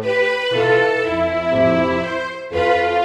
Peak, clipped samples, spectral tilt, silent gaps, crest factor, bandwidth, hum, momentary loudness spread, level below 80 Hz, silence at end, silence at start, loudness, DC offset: -4 dBFS; under 0.1%; -5.5 dB/octave; none; 12 dB; 10.5 kHz; none; 7 LU; -46 dBFS; 0 s; 0 s; -17 LUFS; under 0.1%